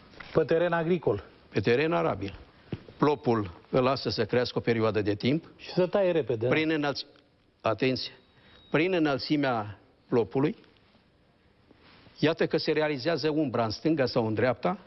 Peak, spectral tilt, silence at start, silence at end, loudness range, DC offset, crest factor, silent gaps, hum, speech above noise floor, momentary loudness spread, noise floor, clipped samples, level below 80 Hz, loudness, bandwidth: -10 dBFS; -7.5 dB/octave; 0.2 s; 0.05 s; 3 LU; under 0.1%; 18 dB; none; none; 36 dB; 8 LU; -63 dBFS; under 0.1%; -60 dBFS; -28 LUFS; 6.2 kHz